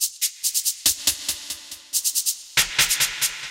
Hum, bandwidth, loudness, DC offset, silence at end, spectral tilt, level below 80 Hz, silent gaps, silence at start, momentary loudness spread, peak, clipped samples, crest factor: none; 17 kHz; -21 LUFS; under 0.1%; 0 s; 2 dB/octave; -52 dBFS; none; 0 s; 9 LU; -4 dBFS; under 0.1%; 20 dB